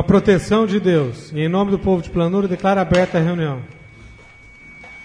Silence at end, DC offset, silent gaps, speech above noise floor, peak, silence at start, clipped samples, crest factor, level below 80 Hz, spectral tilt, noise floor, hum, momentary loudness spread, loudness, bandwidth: 0 s; under 0.1%; none; 27 dB; -2 dBFS; 0 s; under 0.1%; 16 dB; -40 dBFS; -7.5 dB/octave; -43 dBFS; none; 11 LU; -18 LUFS; 10.5 kHz